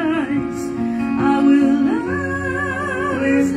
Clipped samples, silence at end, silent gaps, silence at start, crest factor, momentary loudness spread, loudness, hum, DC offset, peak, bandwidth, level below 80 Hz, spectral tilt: under 0.1%; 0 s; none; 0 s; 14 dB; 8 LU; -18 LUFS; none; under 0.1%; -4 dBFS; 10.5 kHz; -46 dBFS; -6.5 dB/octave